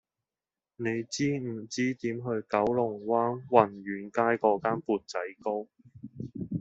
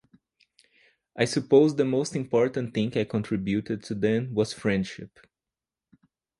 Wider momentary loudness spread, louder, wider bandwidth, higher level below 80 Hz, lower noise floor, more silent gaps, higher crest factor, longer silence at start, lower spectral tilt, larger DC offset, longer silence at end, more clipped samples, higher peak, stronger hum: about the same, 13 LU vs 12 LU; second, -30 LUFS vs -26 LUFS; second, 8 kHz vs 11.5 kHz; second, -68 dBFS vs -60 dBFS; about the same, under -90 dBFS vs under -90 dBFS; neither; first, 26 dB vs 20 dB; second, 0.8 s vs 1.15 s; about the same, -5.5 dB/octave vs -6 dB/octave; neither; second, 0 s vs 1.35 s; neither; about the same, -4 dBFS vs -6 dBFS; neither